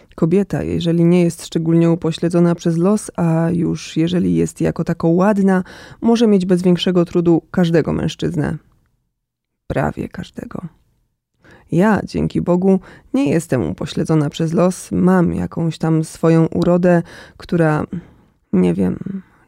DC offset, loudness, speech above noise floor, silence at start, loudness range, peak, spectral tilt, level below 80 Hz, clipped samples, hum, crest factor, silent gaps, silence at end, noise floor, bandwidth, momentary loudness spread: under 0.1%; -17 LUFS; 60 dB; 0.15 s; 6 LU; -2 dBFS; -7.5 dB/octave; -46 dBFS; under 0.1%; none; 14 dB; none; 0.25 s; -76 dBFS; 12.5 kHz; 10 LU